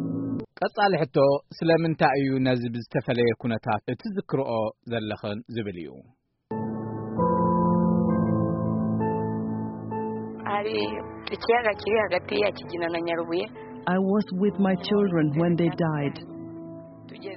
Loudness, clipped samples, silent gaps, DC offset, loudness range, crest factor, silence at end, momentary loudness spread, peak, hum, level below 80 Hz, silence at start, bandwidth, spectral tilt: -26 LUFS; under 0.1%; none; under 0.1%; 5 LU; 18 dB; 0 s; 11 LU; -8 dBFS; none; -56 dBFS; 0 s; 5.8 kHz; -6 dB/octave